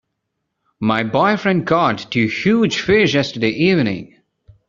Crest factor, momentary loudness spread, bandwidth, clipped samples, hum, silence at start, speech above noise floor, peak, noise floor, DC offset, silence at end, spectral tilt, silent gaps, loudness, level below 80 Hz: 16 dB; 5 LU; 7.6 kHz; under 0.1%; none; 0.8 s; 59 dB; -2 dBFS; -75 dBFS; under 0.1%; 0.6 s; -4 dB/octave; none; -16 LUFS; -52 dBFS